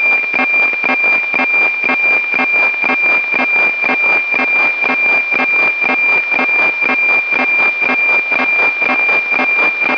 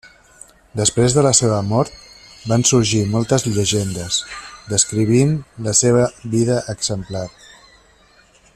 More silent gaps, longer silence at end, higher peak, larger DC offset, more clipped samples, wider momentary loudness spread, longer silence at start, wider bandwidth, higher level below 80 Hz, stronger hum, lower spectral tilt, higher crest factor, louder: neither; second, 0 s vs 1.25 s; about the same, 0 dBFS vs 0 dBFS; first, 0.2% vs under 0.1%; neither; second, 1 LU vs 13 LU; second, 0 s vs 0.75 s; second, 5.4 kHz vs 14 kHz; second, -70 dBFS vs -46 dBFS; neither; about the same, -3.5 dB/octave vs -4.5 dB/octave; second, 12 dB vs 18 dB; first, -10 LUFS vs -17 LUFS